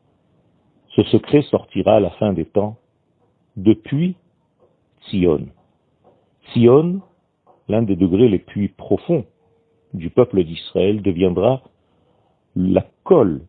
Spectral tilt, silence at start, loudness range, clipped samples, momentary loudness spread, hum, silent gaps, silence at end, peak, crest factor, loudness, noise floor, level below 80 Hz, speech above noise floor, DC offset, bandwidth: -12 dB/octave; 0.95 s; 4 LU; under 0.1%; 11 LU; none; none; 0.05 s; 0 dBFS; 18 dB; -18 LUFS; -62 dBFS; -50 dBFS; 46 dB; under 0.1%; 4.5 kHz